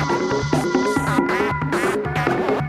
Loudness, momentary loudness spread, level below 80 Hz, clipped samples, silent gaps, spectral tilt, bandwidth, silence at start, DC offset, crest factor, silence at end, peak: -20 LUFS; 2 LU; -42 dBFS; under 0.1%; none; -6 dB/octave; 14 kHz; 0 s; under 0.1%; 16 dB; 0 s; -4 dBFS